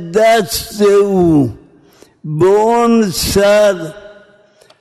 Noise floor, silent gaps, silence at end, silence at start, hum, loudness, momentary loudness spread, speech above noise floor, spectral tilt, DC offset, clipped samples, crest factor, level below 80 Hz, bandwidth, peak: -47 dBFS; none; 0.7 s; 0 s; none; -12 LUFS; 12 LU; 36 dB; -5 dB/octave; under 0.1%; under 0.1%; 12 dB; -38 dBFS; 13.5 kHz; -2 dBFS